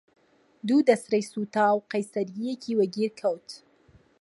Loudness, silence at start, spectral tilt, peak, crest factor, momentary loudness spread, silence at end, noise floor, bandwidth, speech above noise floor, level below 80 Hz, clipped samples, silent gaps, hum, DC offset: -26 LUFS; 0.65 s; -5.5 dB/octave; -6 dBFS; 20 dB; 14 LU; 0.65 s; -60 dBFS; 11.5 kHz; 34 dB; -74 dBFS; under 0.1%; none; none; under 0.1%